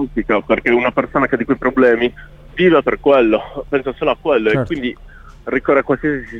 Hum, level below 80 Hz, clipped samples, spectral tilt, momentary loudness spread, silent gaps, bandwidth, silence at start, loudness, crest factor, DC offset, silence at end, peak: none; -40 dBFS; under 0.1%; -8 dB/octave; 8 LU; none; 6.8 kHz; 0 s; -16 LUFS; 14 dB; under 0.1%; 0 s; -2 dBFS